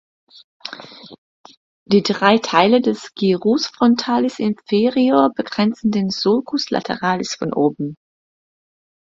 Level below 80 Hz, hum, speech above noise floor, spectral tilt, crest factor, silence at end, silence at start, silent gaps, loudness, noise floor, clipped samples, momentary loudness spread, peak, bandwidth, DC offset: -60 dBFS; none; 20 dB; -5.5 dB/octave; 18 dB; 1.05 s; 0.65 s; 1.18-1.44 s, 1.57-1.86 s; -18 LUFS; -37 dBFS; under 0.1%; 14 LU; 0 dBFS; 7.8 kHz; under 0.1%